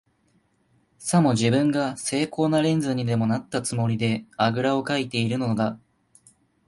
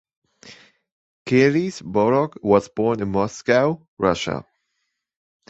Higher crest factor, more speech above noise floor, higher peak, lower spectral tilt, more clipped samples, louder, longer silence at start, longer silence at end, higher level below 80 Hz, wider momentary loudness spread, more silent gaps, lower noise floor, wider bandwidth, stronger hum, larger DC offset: about the same, 16 dB vs 20 dB; second, 43 dB vs 56 dB; second, -8 dBFS vs -2 dBFS; about the same, -5.5 dB/octave vs -6 dB/octave; neither; second, -24 LUFS vs -20 LUFS; first, 1 s vs 0.45 s; second, 0.9 s vs 1.1 s; second, -60 dBFS vs -52 dBFS; about the same, 6 LU vs 7 LU; second, none vs 0.92-1.25 s, 3.88-3.97 s; second, -66 dBFS vs -76 dBFS; first, 11.5 kHz vs 8.2 kHz; neither; neither